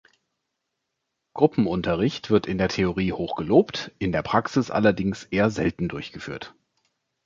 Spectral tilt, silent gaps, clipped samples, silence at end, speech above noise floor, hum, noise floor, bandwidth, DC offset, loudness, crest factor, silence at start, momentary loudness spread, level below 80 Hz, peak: -6.5 dB/octave; none; under 0.1%; 0.75 s; 57 dB; none; -80 dBFS; 7.6 kHz; under 0.1%; -24 LUFS; 22 dB; 1.35 s; 14 LU; -48 dBFS; -4 dBFS